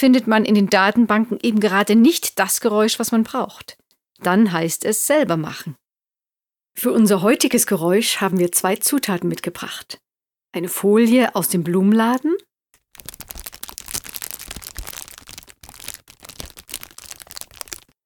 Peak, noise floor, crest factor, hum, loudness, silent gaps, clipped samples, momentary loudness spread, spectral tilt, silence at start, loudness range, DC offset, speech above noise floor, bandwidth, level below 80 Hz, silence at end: -2 dBFS; under -90 dBFS; 18 dB; none; -18 LUFS; none; under 0.1%; 20 LU; -4 dB/octave; 0 s; 15 LU; under 0.1%; over 73 dB; 19 kHz; -50 dBFS; 0.3 s